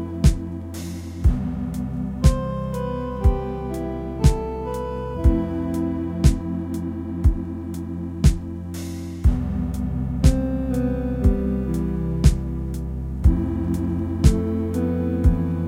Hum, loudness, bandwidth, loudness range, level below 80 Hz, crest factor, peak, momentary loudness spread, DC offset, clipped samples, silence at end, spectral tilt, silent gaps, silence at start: none; -23 LUFS; 15 kHz; 2 LU; -24 dBFS; 20 dB; 0 dBFS; 10 LU; under 0.1%; under 0.1%; 0 s; -7.5 dB/octave; none; 0 s